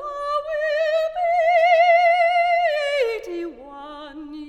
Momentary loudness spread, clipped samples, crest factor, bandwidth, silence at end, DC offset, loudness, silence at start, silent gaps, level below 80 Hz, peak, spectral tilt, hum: 21 LU; under 0.1%; 14 dB; 9.6 kHz; 0 s; under 0.1%; -19 LUFS; 0 s; none; -56 dBFS; -6 dBFS; -2.5 dB/octave; none